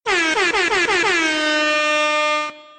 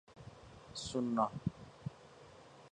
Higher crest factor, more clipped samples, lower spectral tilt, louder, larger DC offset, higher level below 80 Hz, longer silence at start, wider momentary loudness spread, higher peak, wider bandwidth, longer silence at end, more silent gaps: second, 12 dB vs 22 dB; neither; second, -1 dB/octave vs -6 dB/octave; first, -17 LUFS vs -40 LUFS; neither; first, -52 dBFS vs -64 dBFS; about the same, 0.05 s vs 0.1 s; second, 2 LU vs 22 LU; first, -8 dBFS vs -20 dBFS; second, 9.4 kHz vs 10.5 kHz; about the same, 0.15 s vs 0.05 s; neither